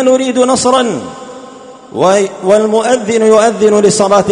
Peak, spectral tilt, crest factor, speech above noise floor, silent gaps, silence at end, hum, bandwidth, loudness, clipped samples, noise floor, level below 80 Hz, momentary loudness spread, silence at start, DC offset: 0 dBFS; -4 dB/octave; 10 dB; 23 dB; none; 0 s; none; 11 kHz; -10 LUFS; 0.2%; -32 dBFS; -50 dBFS; 17 LU; 0 s; under 0.1%